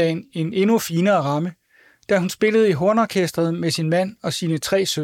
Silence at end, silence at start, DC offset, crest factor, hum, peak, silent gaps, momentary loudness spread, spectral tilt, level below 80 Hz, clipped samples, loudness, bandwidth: 0 s; 0 s; under 0.1%; 14 dB; none; -6 dBFS; none; 8 LU; -5.5 dB/octave; -60 dBFS; under 0.1%; -20 LUFS; 17.5 kHz